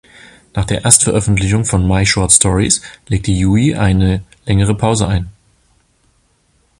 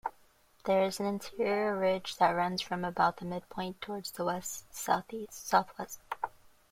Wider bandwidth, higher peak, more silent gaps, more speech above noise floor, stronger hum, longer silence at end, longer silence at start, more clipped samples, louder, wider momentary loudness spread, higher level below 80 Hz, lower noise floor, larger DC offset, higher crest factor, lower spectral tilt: about the same, 16 kHz vs 16.5 kHz; first, 0 dBFS vs -10 dBFS; neither; first, 44 dB vs 32 dB; neither; first, 1.5 s vs 0.4 s; first, 0.55 s vs 0.05 s; first, 0.2% vs under 0.1%; first, -13 LUFS vs -33 LUFS; about the same, 11 LU vs 12 LU; first, -28 dBFS vs -66 dBFS; second, -57 dBFS vs -64 dBFS; neither; second, 14 dB vs 22 dB; about the same, -4 dB/octave vs -4 dB/octave